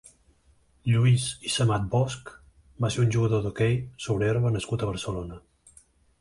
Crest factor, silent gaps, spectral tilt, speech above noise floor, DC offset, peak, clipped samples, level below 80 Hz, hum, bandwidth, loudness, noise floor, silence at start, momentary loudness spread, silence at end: 16 dB; none; -5.5 dB/octave; 37 dB; under 0.1%; -12 dBFS; under 0.1%; -50 dBFS; none; 11.5 kHz; -26 LUFS; -62 dBFS; 0.85 s; 12 LU; 0.8 s